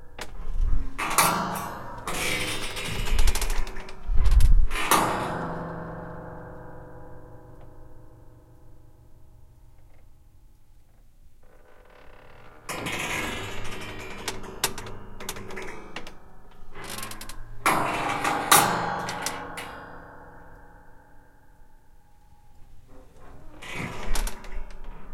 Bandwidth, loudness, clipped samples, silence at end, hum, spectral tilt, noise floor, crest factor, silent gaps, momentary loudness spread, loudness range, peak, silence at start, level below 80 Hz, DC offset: 16.5 kHz; -28 LUFS; under 0.1%; 0 s; none; -3 dB/octave; -51 dBFS; 24 dB; none; 23 LU; 18 LU; -2 dBFS; 0 s; -30 dBFS; under 0.1%